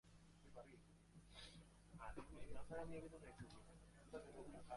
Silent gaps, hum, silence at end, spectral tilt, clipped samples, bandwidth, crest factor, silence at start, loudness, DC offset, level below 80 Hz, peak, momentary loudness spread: none; none; 0 s; -5.5 dB/octave; under 0.1%; 11.5 kHz; 18 dB; 0.05 s; -60 LUFS; under 0.1%; -68 dBFS; -38 dBFS; 13 LU